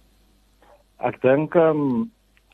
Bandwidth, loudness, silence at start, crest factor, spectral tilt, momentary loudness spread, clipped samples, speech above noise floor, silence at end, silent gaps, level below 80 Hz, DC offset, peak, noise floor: 4.4 kHz; -21 LUFS; 1 s; 20 dB; -9.5 dB/octave; 11 LU; under 0.1%; 39 dB; 0.45 s; none; -60 dBFS; under 0.1%; -4 dBFS; -58 dBFS